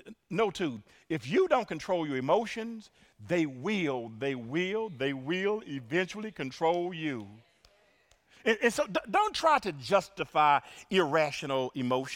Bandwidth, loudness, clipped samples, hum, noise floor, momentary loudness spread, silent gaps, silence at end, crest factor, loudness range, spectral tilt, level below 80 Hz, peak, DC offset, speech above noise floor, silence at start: 16.5 kHz; -30 LUFS; under 0.1%; none; -66 dBFS; 10 LU; none; 0 s; 20 dB; 5 LU; -5 dB/octave; -66 dBFS; -10 dBFS; under 0.1%; 36 dB; 0.05 s